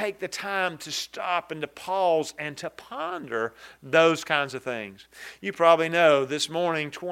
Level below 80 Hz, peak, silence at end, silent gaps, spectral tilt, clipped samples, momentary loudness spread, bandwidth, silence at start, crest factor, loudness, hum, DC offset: -70 dBFS; -4 dBFS; 0 s; none; -3.5 dB/octave; under 0.1%; 15 LU; 16 kHz; 0 s; 22 dB; -25 LUFS; none; under 0.1%